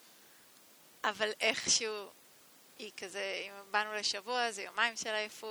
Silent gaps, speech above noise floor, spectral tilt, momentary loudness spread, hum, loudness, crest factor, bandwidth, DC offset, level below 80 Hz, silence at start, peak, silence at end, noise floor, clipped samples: none; 25 dB; 0.5 dB/octave; 15 LU; none; -34 LUFS; 24 dB; over 20 kHz; under 0.1%; -80 dBFS; 0.05 s; -12 dBFS; 0 s; -61 dBFS; under 0.1%